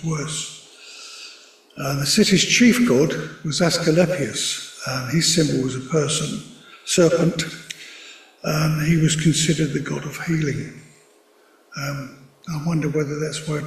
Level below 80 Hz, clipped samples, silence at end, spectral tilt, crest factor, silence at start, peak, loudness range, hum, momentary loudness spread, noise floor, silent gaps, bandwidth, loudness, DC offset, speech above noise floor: -52 dBFS; under 0.1%; 0 s; -4.5 dB/octave; 18 dB; 0 s; -4 dBFS; 9 LU; none; 21 LU; -55 dBFS; none; 15 kHz; -20 LUFS; under 0.1%; 35 dB